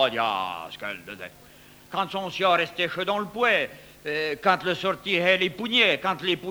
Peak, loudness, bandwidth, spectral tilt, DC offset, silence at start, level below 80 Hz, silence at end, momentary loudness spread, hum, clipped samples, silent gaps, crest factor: -8 dBFS; -24 LUFS; over 20 kHz; -4 dB/octave; under 0.1%; 0 s; -62 dBFS; 0 s; 14 LU; none; under 0.1%; none; 18 dB